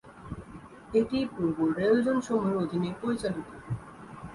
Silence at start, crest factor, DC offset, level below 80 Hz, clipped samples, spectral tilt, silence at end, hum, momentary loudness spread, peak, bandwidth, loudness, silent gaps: 0.05 s; 16 dB; under 0.1%; -56 dBFS; under 0.1%; -7 dB/octave; 0 s; none; 19 LU; -12 dBFS; 11.5 kHz; -29 LUFS; none